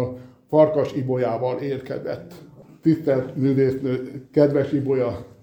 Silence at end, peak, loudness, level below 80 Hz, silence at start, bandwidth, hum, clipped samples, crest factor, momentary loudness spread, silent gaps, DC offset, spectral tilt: 0.15 s; -2 dBFS; -22 LUFS; -58 dBFS; 0 s; 19 kHz; none; under 0.1%; 20 dB; 11 LU; none; under 0.1%; -9 dB/octave